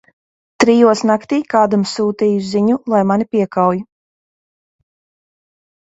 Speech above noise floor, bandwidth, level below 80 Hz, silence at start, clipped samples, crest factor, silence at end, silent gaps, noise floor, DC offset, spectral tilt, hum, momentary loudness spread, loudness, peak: over 76 dB; 8 kHz; -60 dBFS; 0.6 s; under 0.1%; 16 dB; 2 s; none; under -90 dBFS; under 0.1%; -6 dB/octave; none; 6 LU; -15 LUFS; 0 dBFS